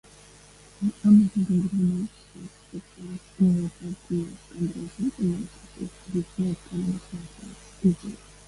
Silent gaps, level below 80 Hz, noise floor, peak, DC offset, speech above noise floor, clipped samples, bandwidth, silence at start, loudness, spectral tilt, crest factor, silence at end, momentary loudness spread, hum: none; -54 dBFS; -51 dBFS; -8 dBFS; under 0.1%; 25 dB; under 0.1%; 11.5 kHz; 0.8 s; -26 LUFS; -8 dB/octave; 18 dB; 0.3 s; 20 LU; 50 Hz at -50 dBFS